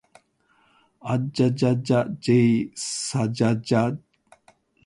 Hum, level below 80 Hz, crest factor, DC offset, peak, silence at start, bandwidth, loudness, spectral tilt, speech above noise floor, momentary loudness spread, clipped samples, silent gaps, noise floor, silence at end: none; -60 dBFS; 16 dB; under 0.1%; -8 dBFS; 1.05 s; 11.5 kHz; -23 LUFS; -6 dB/octave; 42 dB; 9 LU; under 0.1%; none; -64 dBFS; 0.9 s